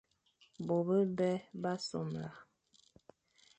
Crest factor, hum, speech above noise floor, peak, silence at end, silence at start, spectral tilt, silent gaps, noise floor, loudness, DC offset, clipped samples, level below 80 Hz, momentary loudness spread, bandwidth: 16 dB; none; 36 dB; -22 dBFS; 1.15 s; 0.6 s; -7 dB/octave; none; -71 dBFS; -36 LUFS; under 0.1%; under 0.1%; -76 dBFS; 13 LU; 9 kHz